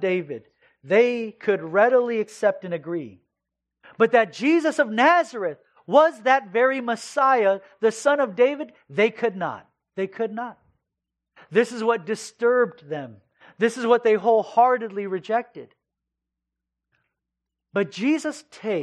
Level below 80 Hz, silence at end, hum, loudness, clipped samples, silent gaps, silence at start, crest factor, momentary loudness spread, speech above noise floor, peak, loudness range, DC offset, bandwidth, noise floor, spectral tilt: -80 dBFS; 0 s; none; -22 LUFS; under 0.1%; none; 0 s; 20 dB; 14 LU; 63 dB; -4 dBFS; 7 LU; under 0.1%; 11 kHz; -85 dBFS; -5 dB/octave